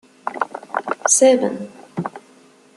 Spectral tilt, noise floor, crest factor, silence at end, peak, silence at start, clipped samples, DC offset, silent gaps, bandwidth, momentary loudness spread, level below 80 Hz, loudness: -3 dB/octave; -50 dBFS; 20 dB; 0.6 s; -2 dBFS; 0.25 s; under 0.1%; under 0.1%; none; 12.5 kHz; 19 LU; -70 dBFS; -18 LUFS